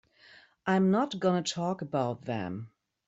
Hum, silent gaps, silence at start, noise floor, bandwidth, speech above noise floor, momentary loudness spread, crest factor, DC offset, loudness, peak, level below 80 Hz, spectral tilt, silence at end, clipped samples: none; none; 0.65 s; -58 dBFS; 8 kHz; 29 dB; 13 LU; 16 dB; under 0.1%; -30 LUFS; -14 dBFS; -70 dBFS; -6 dB/octave; 0.4 s; under 0.1%